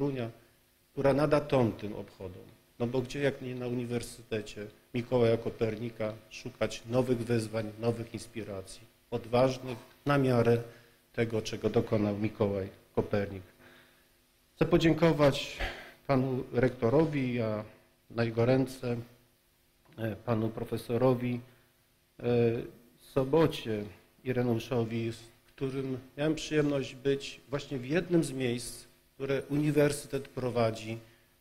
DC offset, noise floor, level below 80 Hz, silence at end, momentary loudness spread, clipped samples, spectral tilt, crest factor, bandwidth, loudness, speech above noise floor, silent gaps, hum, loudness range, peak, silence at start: under 0.1%; -68 dBFS; -54 dBFS; 0.35 s; 14 LU; under 0.1%; -6.5 dB/octave; 18 dB; 16 kHz; -31 LUFS; 38 dB; none; none; 4 LU; -14 dBFS; 0 s